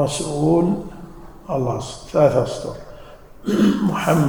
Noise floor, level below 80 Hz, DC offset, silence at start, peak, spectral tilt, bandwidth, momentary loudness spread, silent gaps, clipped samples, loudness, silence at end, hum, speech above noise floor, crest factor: -40 dBFS; -44 dBFS; under 0.1%; 0 s; -2 dBFS; -6.5 dB/octave; over 20 kHz; 21 LU; none; under 0.1%; -20 LUFS; 0 s; none; 22 dB; 18 dB